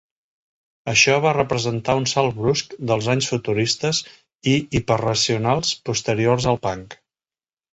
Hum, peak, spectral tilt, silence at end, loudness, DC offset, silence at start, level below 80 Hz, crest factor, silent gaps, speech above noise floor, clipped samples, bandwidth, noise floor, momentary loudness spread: none; -2 dBFS; -4 dB/octave; 0.8 s; -20 LUFS; under 0.1%; 0.85 s; -48 dBFS; 18 dB; 4.35-4.39 s; over 70 dB; under 0.1%; 8.2 kHz; under -90 dBFS; 8 LU